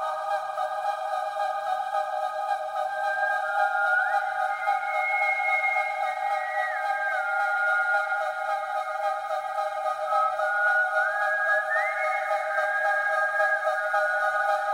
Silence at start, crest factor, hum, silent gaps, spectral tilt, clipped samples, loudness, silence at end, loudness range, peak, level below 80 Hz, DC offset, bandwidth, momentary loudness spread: 0 s; 14 dB; none; none; 0 dB/octave; under 0.1%; -26 LUFS; 0 s; 2 LU; -12 dBFS; -76 dBFS; under 0.1%; 16.5 kHz; 6 LU